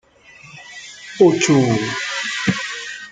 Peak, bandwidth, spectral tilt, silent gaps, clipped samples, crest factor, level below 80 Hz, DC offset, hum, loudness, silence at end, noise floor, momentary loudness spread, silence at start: -2 dBFS; 9.6 kHz; -4.5 dB/octave; none; under 0.1%; 18 dB; -56 dBFS; under 0.1%; none; -18 LUFS; 0 s; -45 dBFS; 20 LU; 0.45 s